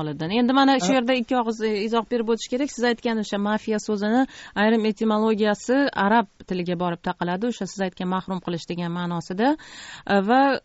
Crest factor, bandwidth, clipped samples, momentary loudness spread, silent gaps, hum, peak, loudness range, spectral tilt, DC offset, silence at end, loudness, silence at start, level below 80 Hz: 16 dB; 8 kHz; under 0.1%; 9 LU; none; none; -6 dBFS; 4 LU; -4 dB/octave; under 0.1%; 0.05 s; -23 LUFS; 0 s; -58 dBFS